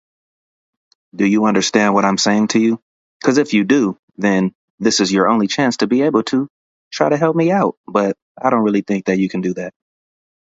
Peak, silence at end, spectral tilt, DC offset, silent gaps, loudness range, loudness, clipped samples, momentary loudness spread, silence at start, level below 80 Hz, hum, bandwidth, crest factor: 0 dBFS; 0.8 s; -5 dB/octave; under 0.1%; 2.82-3.20 s, 3.99-4.08 s, 4.55-4.78 s, 6.50-6.91 s, 7.77-7.84 s, 8.22-8.35 s; 2 LU; -16 LUFS; under 0.1%; 8 LU; 1.15 s; -60 dBFS; none; 8 kHz; 16 dB